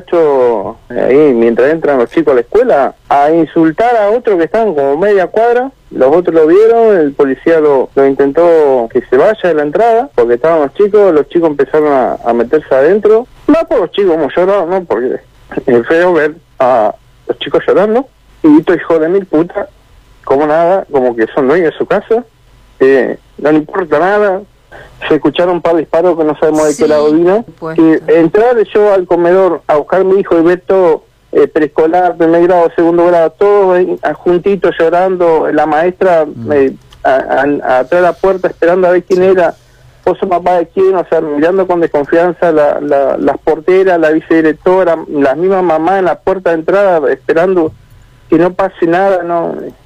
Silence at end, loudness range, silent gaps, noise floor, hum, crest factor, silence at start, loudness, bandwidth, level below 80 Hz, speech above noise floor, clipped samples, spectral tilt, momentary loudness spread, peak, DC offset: 0.15 s; 3 LU; none; -39 dBFS; none; 10 dB; 0 s; -10 LUFS; 9.6 kHz; -44 dBFS; 30 dB; under 0.1%; -7 dB/octave; 6 LU; 0 dBFS; under 0.1%